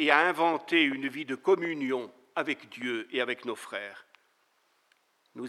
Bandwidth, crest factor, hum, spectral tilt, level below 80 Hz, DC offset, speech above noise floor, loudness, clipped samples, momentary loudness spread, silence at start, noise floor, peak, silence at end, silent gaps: 13.5 kHz; 24 dB; none; -4 dB/octave; under -90 dBFS; under 0.1%; 42 dB; -29 LUFS; under 0.1%; 12 LU; 0 s; -71 dBFS; -6 dBFS; 0 s; none